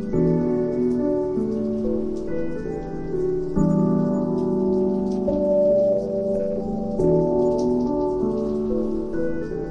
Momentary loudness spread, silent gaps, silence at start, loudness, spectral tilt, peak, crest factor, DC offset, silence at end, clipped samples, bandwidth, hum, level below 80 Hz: 8 LU; none; 0 s; -23 LUFS; -10 dB/octave; -8 dBFS; 14 dB; under 0.1%; 0 s; under 0.1%; 7.4 kHz; none; -40 dBFS